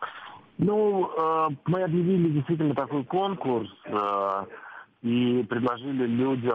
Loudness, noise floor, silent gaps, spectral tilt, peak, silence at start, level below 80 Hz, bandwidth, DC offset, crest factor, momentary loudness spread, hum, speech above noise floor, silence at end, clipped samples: -26 LUFS; -45 dBFS; none; -9.5 dB/octave; -14 dBFS; 0 s; -66 dBFS; 5 kHz; under 0.1%; 12 dB; 10 LU; none; 20 dB; 0 s; under 0.1%